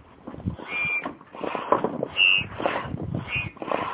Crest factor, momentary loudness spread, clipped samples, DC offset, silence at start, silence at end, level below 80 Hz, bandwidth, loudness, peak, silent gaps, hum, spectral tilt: 24 dB; 17 LU; under 0.1%; under 0.1%; 0 s; 0 s; -48 dBFS; 4 kHz; -25 LUFS; -4 dBFS; none; none; -1.5 dB/octave